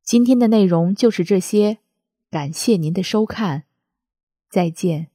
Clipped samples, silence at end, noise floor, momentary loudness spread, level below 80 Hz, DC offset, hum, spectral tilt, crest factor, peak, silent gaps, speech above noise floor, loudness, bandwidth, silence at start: under 0.1%; 0.1 s; -65 dBFS; 12 LU; -62 dBFS; under 0.1%; none; -6 dB/octave; 16 dB; -2 dBFS; 4.23-4.27 s; 48 dB; -18 LUFS; 15.5 kHz; 0.05 s